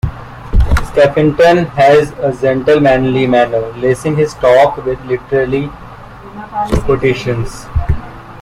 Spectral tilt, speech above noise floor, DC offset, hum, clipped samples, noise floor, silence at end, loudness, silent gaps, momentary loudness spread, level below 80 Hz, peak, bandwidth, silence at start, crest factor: -7 dB/octave; 20 dB; under 0.1%; none; under 0.1%; -32 dBFS; 0 s; -12 LUFS; none; 15 LU; -22 dBFS; 0 dBFS; 15.5 kHz; 0.05 s; 12 dB